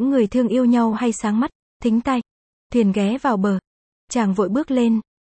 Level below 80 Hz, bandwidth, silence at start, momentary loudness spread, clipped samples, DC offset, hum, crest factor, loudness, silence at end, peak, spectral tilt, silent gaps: -52 dBFS; 8.8 kHz; 0 s; 7 LU; under 0.1%; under 0.1%; none; 14 dB; -20 LUFS; 0.25 s; -6 dBFS; -6.5 dB/octave; 1.55-1.80 s, 2.31-2.70 s, 3.67-4.08 s